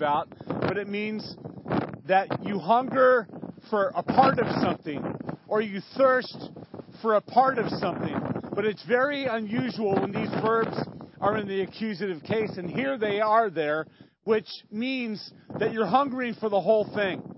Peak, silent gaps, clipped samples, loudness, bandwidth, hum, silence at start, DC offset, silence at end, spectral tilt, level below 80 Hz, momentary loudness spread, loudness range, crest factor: -6 dBFS; none; under 0.1%; -26 LUFS; 5.8 kHz; none; 0 s; under 0.1%; 0 s; -10 dB/octave; -62 dBFS; 12 LU; 3 LU; 20 dB